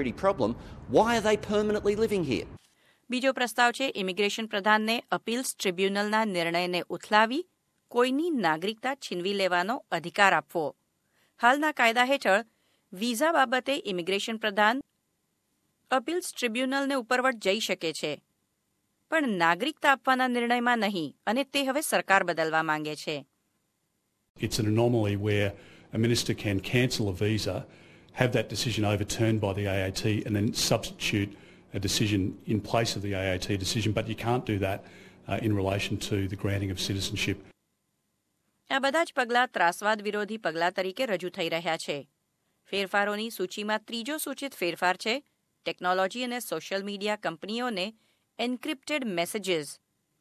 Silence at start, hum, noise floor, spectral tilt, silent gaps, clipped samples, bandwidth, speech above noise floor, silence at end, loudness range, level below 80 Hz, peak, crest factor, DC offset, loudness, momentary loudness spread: 0 s; none; -77 dBFS; -4.5 dB/octave; 24.30-24.35 s; under 0.1%; 14.5 kHz; 49 dB; 0.45 s; 5 LU; -54 dBFS; -4 dBFS; 24 dB; under 0.1%; -28 LUFS; 9 LU